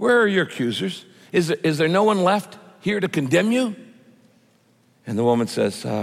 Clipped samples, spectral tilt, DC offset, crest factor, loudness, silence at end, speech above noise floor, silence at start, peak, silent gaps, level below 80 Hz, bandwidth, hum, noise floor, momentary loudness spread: under 0.1%; -5.5 dB/octave; under 0.1%; 16 dB; -21 LUFS; 0 s; 39 dB; 0 s; -6 dBFS; none; -68 dBFS; 15.5 kHz; none; -59 dBFS; 12 LU